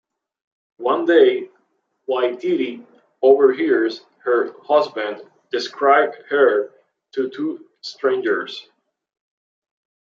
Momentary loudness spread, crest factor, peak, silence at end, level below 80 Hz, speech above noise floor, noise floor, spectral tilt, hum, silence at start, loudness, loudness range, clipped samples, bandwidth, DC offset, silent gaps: 18 LU; 18 dB; -2 dBFS; 1.45 s; -76 dBFS; 50 dB; -68 dBFS; -5 dB/octave; none; 0.8 s; -19 LUFS; 4 LU; under 0.1%; 7.2 kHz; under 0.1%; none